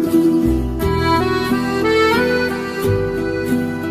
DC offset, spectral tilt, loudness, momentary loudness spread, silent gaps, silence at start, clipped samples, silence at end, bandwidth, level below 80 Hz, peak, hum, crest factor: under 0.1%; -6 dB/octave; -17 LUFS; 6 LU; none; 0 s; under 0.1%; 0 s; 15.5 kHz; -30 dBFS; -2 dBFS; none; 14 dB